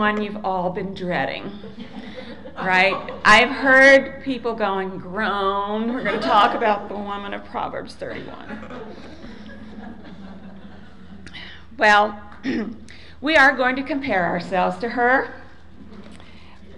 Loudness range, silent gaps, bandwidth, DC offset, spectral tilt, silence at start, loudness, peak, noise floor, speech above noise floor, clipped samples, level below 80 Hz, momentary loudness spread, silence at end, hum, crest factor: 17 LU; none; 11 kHz; 0.9%; -4.5 dB/octave; 0 s; -19 LUFS; -4 dBFS; -45 dBFS; 25 dB; under 0.1%; -48 dBFS; 25 LU; 0 s; none; 18 dB